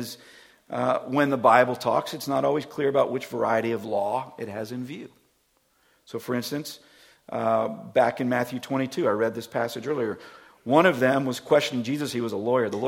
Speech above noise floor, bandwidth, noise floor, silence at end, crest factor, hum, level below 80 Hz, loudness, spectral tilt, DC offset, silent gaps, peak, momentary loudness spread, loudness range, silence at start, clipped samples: 43 dB; 17 kHz; -68 dBFS; 0 s; 22 dB; none; -70 dBFS; -25 LUFS; -5.5 dB/octave; under 0.1%; none; -2 dBFS; 15 LU; 8 LU; 0 s; under 0.1%